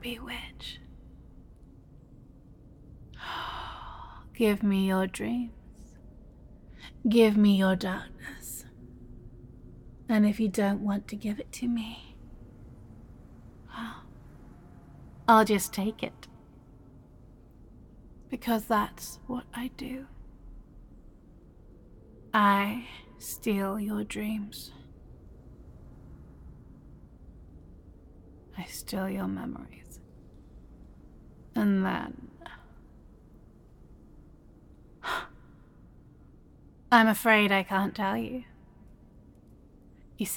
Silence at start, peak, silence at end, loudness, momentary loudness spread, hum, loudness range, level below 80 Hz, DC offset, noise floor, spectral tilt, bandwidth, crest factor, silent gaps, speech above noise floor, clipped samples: 0 s; -6 dBFS; 0 s; -28 LUFS; 29 LU; none; 16 LU; -54 dBFS; under 0.1%; -55 dBFS; -5 dB/octave; 17.5 kHz; 26 dB; none; 27 dB; under 0.1%